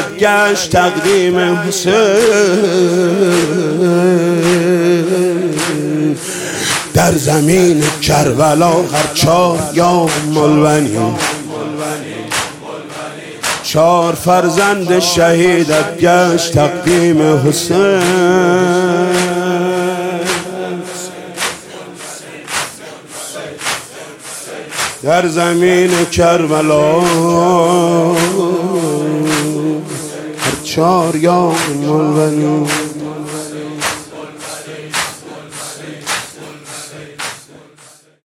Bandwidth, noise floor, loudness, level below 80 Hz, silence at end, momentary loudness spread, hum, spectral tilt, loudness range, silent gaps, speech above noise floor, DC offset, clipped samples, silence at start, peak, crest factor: 16.5 kHz; -43 dBFS; -12 LUFS; -44 dBFS; 0.9 s; 15 LU; none; -4.5 dB/octave; 11 LU; none; 33 dB; under 0.1%; under 0.1%; 0 s; 0 dBFS; 12 dB